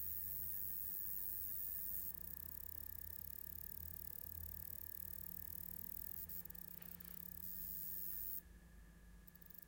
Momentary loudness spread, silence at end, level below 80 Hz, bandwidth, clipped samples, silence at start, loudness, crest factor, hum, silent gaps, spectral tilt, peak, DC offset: 9 LU; 0 s; -64 dBFS; 17 kHz; under 0.1%; 0 s; -45 LUFS; 18 dB; none; none; -3.5 dB/octave; -30 dBFS; under 0.1%